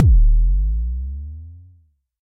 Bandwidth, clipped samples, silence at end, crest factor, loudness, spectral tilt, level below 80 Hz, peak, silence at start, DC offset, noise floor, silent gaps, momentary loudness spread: 0.5 kHz; under 0.1%; 0.65 s; 14 dB; -20 LUFS; -14 dB/octave; -18 dBFS; -2 dBFS; 0 s; under 0.1%; -55 dBFS; none; 21 LU